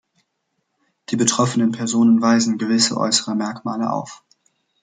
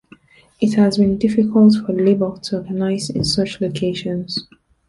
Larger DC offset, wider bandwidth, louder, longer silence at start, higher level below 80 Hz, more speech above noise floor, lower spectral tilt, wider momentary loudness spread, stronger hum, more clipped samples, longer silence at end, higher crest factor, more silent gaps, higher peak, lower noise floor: neither; second, 9.6 kHz vs 11.5 kHz; about the same, -18 LUFS vs -18 LUFS; first, 1.1 s vs 0.6 s; second, -66 dBFS vs -48 dBFS; first, 55 dB vs 31 dB; second, -3.5 dB/octave vs -6.5 dB/octave; about the same, 10 LU vs 11 LU; neither; neither; first, 0.7 s vs 0.45 s; about the same, 18 dB vs 14 dB; neither; about the same, -2 dBFS vs -2 dBFS; first, -73 dBFS vs -48 dBFS